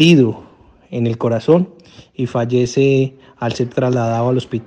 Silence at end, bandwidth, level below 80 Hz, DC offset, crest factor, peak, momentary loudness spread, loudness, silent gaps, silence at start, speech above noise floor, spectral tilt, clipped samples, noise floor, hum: 0 s; 9.4 kHz; -54 dBFS; under 0.1%; 16 dB; 0 dBFS; 11 LU; -17 LUFS; none; 0 s; 30 dB; -6.5 dB/octave; under 0.1%; -45 dBFS; none